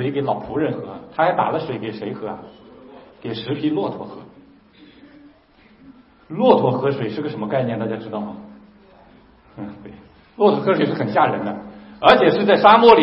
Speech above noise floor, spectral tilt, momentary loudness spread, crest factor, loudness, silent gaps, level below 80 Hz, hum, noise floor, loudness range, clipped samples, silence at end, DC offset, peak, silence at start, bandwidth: 34 dB; -8 dB/octave; 22 LU; 20 dB; -18 LUFS; none; -56 dBFS; none; -52 dBFS; 11 LU; under 0.1%; 0 s; under 0.1%; 0 dBFS; 0 s; 5.8 kHz